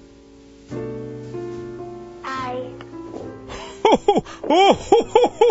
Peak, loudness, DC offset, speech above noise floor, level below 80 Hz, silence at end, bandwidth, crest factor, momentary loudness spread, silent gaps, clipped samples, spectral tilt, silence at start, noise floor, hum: 0 dBFS; -19 LUFS; under 0.1%; 30 dB; -50 dBFS; 0 s; 8 kHz; 20 dB; 20 LU; none; under 0.1%; -5 dB/octave; 0.7 s; -46 dBFS; none